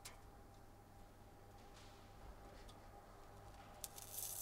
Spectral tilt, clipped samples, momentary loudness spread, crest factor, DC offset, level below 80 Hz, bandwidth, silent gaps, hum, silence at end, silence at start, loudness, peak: -2.5 dB/octave; under 0.1%; 14 LU; 36 dB; under 0.1%; -64 dBFS; 16 kHz; none; none; 0 s; 0 s; -57 LUFS; -22 dBFS